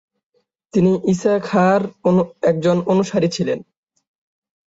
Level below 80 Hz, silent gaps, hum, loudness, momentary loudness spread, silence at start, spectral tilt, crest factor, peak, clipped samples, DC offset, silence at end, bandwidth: -56 dBFS; none; none; -18 LUFS; 6 LU; 0.75 s; -7 dB/octave; 16 dB; -4 dBFS; under 0.1%; under 0.1%; 1.05 s; 8 kHz